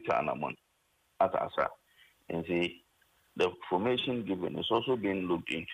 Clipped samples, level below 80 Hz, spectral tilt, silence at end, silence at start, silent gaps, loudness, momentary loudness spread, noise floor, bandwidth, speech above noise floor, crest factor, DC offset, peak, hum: under 0.1%; -66 dBFS; -6 dB/octave; 0 s; 0 s; none; -32 LUFS; 8 LU; -73 dBFS; 15 kHz; 41 dB; 18 dB; under 0.1%; -16 dBFS; none